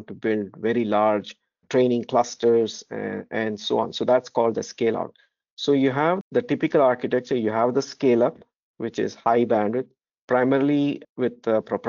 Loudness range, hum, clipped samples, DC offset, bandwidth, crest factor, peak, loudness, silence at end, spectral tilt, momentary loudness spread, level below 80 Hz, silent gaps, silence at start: 2 LU; none; under 0.1%; under 0.1%; 7.4 kHz; 16 dB; -6 dBFS; -23 LUFS; 0 s; -5 dB/octave; 9 LU; -70 dBFS; 5.50-5.57 s, 6.21-6.31 s, 8.56-8.74 s, 10.18-10.28 s, 11.09-11.16 s; 0 s